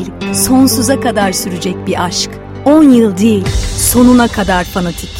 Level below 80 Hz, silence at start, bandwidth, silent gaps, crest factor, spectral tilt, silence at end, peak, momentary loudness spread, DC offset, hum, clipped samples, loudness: -26 dBFS; 0 s; 16.5 kHz; none; 10 dB; -4.5 dB/octave; 0 s; 0 dBFS; 10 LU; under 0.1%; none; 0.2%; -11 LUFS